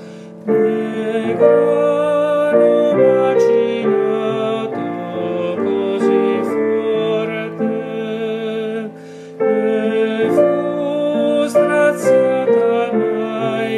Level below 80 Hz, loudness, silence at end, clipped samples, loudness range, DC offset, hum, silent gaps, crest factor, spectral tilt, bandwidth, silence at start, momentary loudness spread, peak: -70 dBFS; -16 LUFS; 0 s; under 0.1%; 6 LU; under 0.1%; none; none; 16 dB; -6.5 dB/octave; 12.5 kHz; 0 s; 10 LU; 0 dBFS